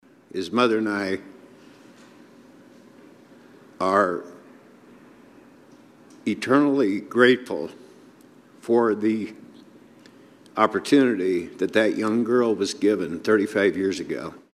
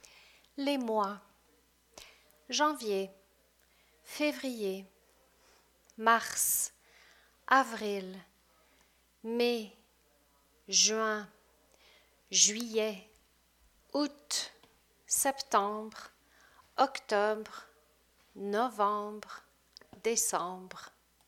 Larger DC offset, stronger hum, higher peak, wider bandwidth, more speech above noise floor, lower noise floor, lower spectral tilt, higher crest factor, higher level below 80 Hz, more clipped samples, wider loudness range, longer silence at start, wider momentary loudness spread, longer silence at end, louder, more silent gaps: neither; second, none vs 60 Hz at -65 dBFS; first, -2 dBFS vs -10 dBFS; second, 13.5 kHz vs 18.5 kHz; second, 30 dB vs 37 dB; second, -51 dBFS vs -69 dBFS; first, -5.5 dB/octave vs -1 dB/octave; about the same, 22 dB vs 24 dB; about the same, -70 dBFS vs -74 dBFS; neither; about the same, 7 LU vs 5 LU; second, 0.35 s vs 0.55 s; second, 14 LU vs 22 LU; second, 0.15 s vs 0.4 s; first, -22 LUFS vs -31 LUFS; neither